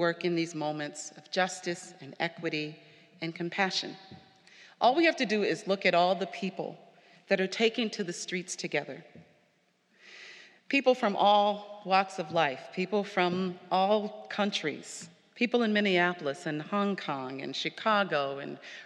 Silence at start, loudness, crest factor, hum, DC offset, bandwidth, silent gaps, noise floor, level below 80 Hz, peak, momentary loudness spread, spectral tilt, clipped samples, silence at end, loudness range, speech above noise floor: 0 s; -30 LUFS; 20 dB; none; under 0.1%; 11.5 kHz; none; -70 dBFS; -88 dBFS; -10 dBFS; 15 LU; -4.5 dB/octave; under 0.1%; 0 s; 6 LU; 40 dB